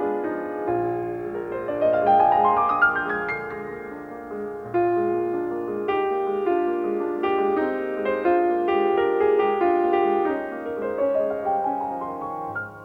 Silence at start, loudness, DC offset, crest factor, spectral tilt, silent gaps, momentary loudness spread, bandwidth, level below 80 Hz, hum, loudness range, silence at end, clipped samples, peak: 0 s; -23 LUFS; under 0.1%; 16 dB; -8 dB/octave; none; 11 LU; 4.7 kHz; -58 dBFS; none; 3 LU; 0 s; under 0.1%; -6 dBFS